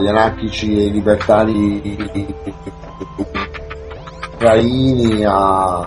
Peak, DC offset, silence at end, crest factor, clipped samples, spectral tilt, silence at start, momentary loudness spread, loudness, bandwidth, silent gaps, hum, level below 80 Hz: 0 dBFS; under 0.1%; 0 s; 16 dB; under 0.1%; -7 dB/octave; 0 s; 18 LU; -15 LUFS; 10.5 kHz; none; none; -34 dBFS